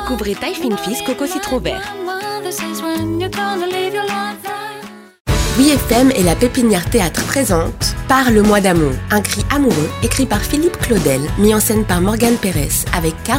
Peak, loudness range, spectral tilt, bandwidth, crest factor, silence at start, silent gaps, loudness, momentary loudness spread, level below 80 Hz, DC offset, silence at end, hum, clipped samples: 0 dBFS; 7 LU; -4.5 dB/octave; 16.5 kHz; 16 dB; 0 s; 5.20-5.25 s; -15 LUFS; 10 LU; -28 dBFS; under 0.1%; 0 s; none; under 0.1%